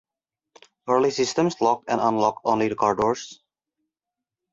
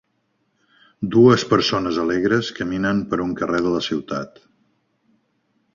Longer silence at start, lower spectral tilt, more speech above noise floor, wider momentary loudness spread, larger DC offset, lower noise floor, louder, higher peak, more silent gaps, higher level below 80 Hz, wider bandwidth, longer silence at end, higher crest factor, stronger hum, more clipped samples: second, 0.85 s vs 1 s; about the same, -5 dB/octave vs -6 dB/octave; first, 65 dB vs 50 dB; second, 6 LU vs 14 LU; neither; first, -87 dBFS vs -69 dBFS; second, -23 LUFS vs -20 LUFS; second, -6 dBFS vs -2 dBFS; neither; second, -62 dBFS vs -52 dBFS; about the same, 7.8 kHz vs 7.4 kHz; second, 1.2 s vs 1.5 s; about the same, 18 dB vs 20 dB; neither; neither